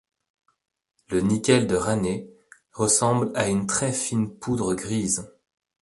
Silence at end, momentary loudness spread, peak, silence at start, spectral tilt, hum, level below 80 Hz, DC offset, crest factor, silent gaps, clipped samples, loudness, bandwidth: 0.55 s; 7 LU; -4 dBFS; 1.1 s; -4.5 dB/octave; none; -52 dBFS; under 0.1%; 20 dB; none; under 0.1%; -24 LUFS; 11.5 kHz